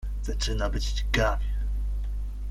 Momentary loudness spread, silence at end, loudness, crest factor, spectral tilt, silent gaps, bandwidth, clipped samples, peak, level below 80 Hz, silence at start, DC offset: 8 LU; 0 s; -30 LUFS; 18 dB; -4.5 dB/octave; none; 12.5 kHz; under 0.1%; -8 dBFS; -28 dBFS; 0 s; under 0.1%